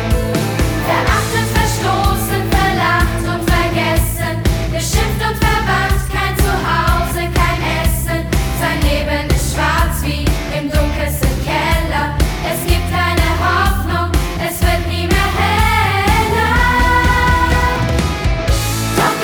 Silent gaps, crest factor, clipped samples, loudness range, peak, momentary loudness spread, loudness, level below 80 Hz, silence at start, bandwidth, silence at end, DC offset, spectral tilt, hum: none; 14 dB; under 0.1%; 3 LU; 0 dBFS; 5 LU; -15 LUFS; -20 dBFS; 0 s; over 20 kHz; 0 s; under 0.1%; -4.5 dB/octave; none